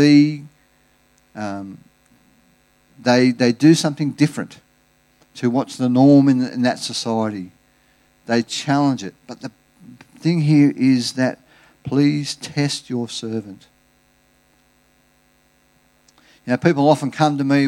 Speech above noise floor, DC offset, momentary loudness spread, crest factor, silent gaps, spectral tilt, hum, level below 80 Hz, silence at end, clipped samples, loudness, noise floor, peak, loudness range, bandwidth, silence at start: 41 dB; under 0.1%; 20 LU; 18 dB; none; -6 dB/octave; none; -66 dBFS; 0 s; under 0.1%; -18 LUFS; -59 dBFS; -2 dBFS; 9 LU; 12 kHz; 0 s